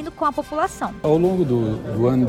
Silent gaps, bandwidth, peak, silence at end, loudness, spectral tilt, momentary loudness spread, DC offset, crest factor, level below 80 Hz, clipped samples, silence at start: none; 14.5 kHz; -6 dBFS; 0 s; -21 LUFS; -7.5 dB/octave; 6 LU; under 0.1%; 14 dB; -44 dBFS; under 0.1%; 0 s